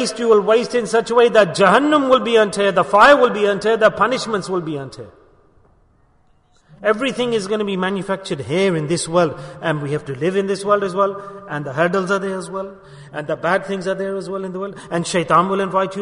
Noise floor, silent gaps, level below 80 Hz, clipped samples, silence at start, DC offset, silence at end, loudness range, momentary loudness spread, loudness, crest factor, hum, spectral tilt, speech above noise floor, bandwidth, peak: -56 dBFS; none; -54 dBFS; under 0.1%; 0 s; under 0.1%; 0 s; 10 LU; 13 LU; -17 LUFS; 18 dB; none; -5 dB/octave; 38 dB; 11 kHz; 0 dBFS